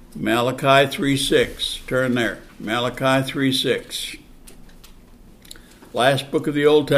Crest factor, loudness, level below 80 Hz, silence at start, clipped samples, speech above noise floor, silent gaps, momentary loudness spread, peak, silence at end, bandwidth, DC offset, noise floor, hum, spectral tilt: 20 dB; -20 LUFS; -46 dBFS; 0 s; under 0.1%; 26 dB; none; 12 LU; -2 dBFS; 0 s; 15.5 kHz; under 0.1%; -46 dBFS; none; -4.5 dB/octave